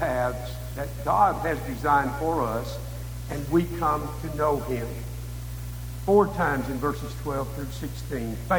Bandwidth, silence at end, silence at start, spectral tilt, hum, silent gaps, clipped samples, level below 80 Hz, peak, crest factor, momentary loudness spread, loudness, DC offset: over 20 kHz; 0 s; 0 s; -6.5 dB/octave; 60 Hz at -35 dBFS; none; under 0.1%; -38 dBFS; -8 dBFS; 20 dB; 14 LU; -27 LUFS; under 0.1%